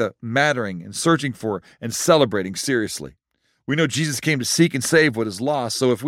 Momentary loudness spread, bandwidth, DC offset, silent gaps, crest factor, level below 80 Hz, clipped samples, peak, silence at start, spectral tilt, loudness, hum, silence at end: 11 LU; 16.5 kHz; under 0.1%; none; 18 dB; -62 dBFS; under 0.1%; -4 dBFS; 0 s; -4 dB/octave; -20 LUFS; none; 0 s